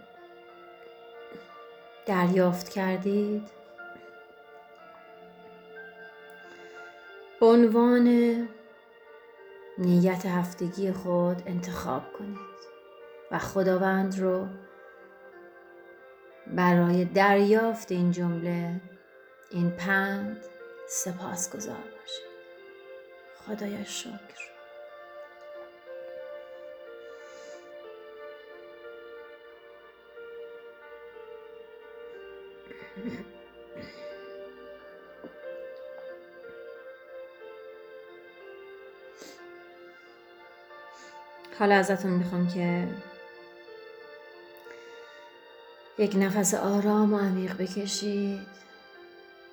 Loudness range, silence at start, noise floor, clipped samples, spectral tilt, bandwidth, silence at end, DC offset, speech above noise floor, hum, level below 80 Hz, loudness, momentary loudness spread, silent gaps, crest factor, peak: 21 LU; 0.15 s; -54 dBFS; under 0.1%; -5.5 dB/octave; over 20 kHz; 0.05 s; under 0.1%; 28 dB; none; -70 dBFS; -27 LUFS; 26 LU; none; 22 dB; -8 dBFS